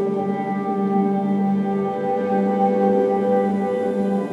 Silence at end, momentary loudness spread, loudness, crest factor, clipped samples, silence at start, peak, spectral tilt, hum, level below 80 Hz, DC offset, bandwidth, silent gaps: 0 s; 5 LU; -20 LUFS; 14 dB; under 0.1%; 0 s; -6 dBFS; -9.5 dB/octave; none; -70 dBFS; under 0.1%; 5.8 kHz; none